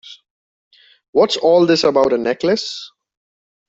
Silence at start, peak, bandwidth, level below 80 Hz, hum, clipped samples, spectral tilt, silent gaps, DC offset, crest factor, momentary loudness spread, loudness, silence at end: 0.05 s; -2 dBFS; 7.8 kHz; -60 dBFS; none; under 0.1%; -4.5 dB/octave; 0.30-0.71 s, 1.08-1.13 s; under 0.1%; 16 dB; 9 LU; -15 LUFS; 0.8 s